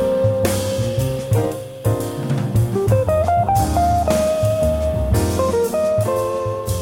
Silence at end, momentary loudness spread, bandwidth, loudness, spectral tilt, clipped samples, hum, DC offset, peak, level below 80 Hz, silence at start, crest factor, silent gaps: 0 s; 5 LU; 17 kHz; -19 LUFS; -6.5 dB/octave; under 0.1%; none; under 0.1%; -2 dBFS; -30 dBFS; 0 s; 14 dB; none